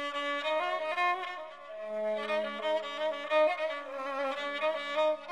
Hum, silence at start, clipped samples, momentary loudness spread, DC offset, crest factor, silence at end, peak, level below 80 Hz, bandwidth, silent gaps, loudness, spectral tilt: none; 0 s; under 0.1%; 9 LU; under 0.1%; 16 dB; 0 s; -16 dBFS; -82 dBFS; 11.5 kHz; none; -32 LUFS; -2.5 dB/octave